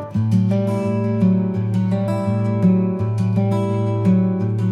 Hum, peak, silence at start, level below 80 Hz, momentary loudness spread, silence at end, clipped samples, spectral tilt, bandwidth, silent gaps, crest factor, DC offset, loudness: none; -6 dBFS; 0 s; -56 dBFS; 4 LU; 0 s; under 0.1%; -10 dB/octave; 9 kHz; none; 12 dB; under 0.1%; -19 LUFS